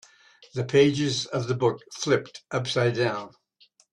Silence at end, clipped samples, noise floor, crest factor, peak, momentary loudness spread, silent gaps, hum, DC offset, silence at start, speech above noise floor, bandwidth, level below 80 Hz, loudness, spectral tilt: 0.65 s; under 0.1%; -62 dBFS; 18 dB; -8 dBFS; 12 LU; none; none; under 0.1%; 0.55 s; 37 dB; 11 kHz; -64 dBFS; -25 LUFS; -5 dB/octave